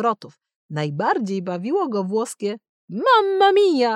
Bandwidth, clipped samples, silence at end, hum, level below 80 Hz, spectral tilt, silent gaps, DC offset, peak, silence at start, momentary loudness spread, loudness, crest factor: 12.5 kHz; under 0.1%; 0 s; none; -80 dBFS; -5.5 dB/octave; 0.56-0.69 s, 2.69-2.88 s; under 0.1%; -6 dBFS; 0 s; 15 LU; -20 LUFS; 14 dB